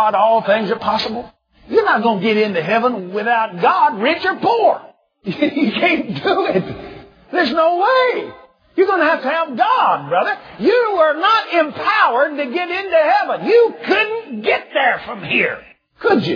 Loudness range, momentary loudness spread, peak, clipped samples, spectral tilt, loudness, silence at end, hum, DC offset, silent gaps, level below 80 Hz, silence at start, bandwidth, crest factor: 2 LU; 8 LU; -2 dBFS; under 0.1%; -6.5 dB/octave; -16 LUFS; 0 s; none; under 0.1%; none; -58 dBFS; 0 s; 5.4 kHz; 16 dB